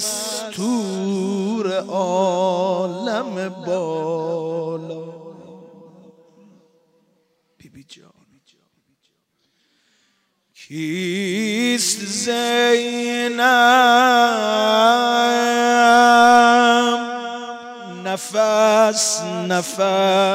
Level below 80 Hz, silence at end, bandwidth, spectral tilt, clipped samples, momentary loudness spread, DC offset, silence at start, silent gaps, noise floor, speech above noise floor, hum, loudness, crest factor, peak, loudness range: -72 dBFS; 0 s; 16 kHz; -3 dB/octave; under 0.1%; 15 LU; under 0.1%; 0 s; none; -68 dBFS; 51 dB; none; -17 LUFS; 16 dB; -2 dBFS; 15 LU